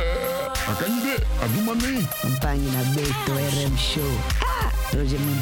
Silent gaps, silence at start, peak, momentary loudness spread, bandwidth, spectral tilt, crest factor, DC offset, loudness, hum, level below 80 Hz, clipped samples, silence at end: none; 0 s; -6 dBFS; 2 LU; 17.5 kHz; -5 dB/octave; 16 dB; under 0.1%; -24 LUFS; none; -28 dBFS; under 0.1%; 0 s